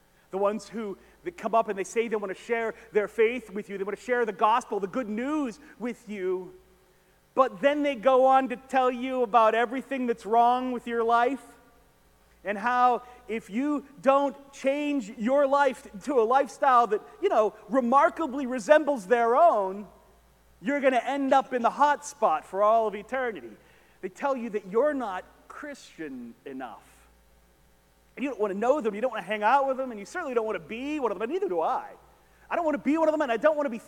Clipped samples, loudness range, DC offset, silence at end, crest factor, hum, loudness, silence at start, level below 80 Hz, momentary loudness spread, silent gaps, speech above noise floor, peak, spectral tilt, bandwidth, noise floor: under 0.1%; 8 LU; under 0.1%; 0.05 s; 22 dB; none; -26 LUFS; 0.35 s; -66 dBFS; 15 LU; none; 36 dB; -4 dBFS; -5 dB/octave; 16.5 kHz; -62 dBFS